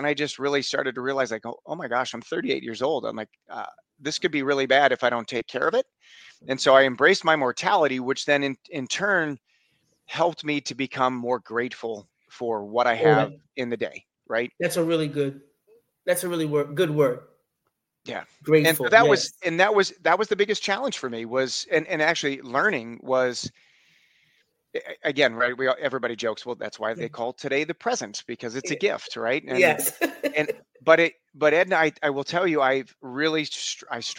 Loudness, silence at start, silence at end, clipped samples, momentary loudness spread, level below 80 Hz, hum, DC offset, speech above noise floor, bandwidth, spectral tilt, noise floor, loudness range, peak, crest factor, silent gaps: -24 LUFS; 0 s; 0 s; under 0.1%; 15 LU; -72 dBFS; none; under 0.1%; 53 dB; 16.5 kHz; -4 dB/octave; -78 dBFS; 6 LU; -2 dBFS; 24 dB; none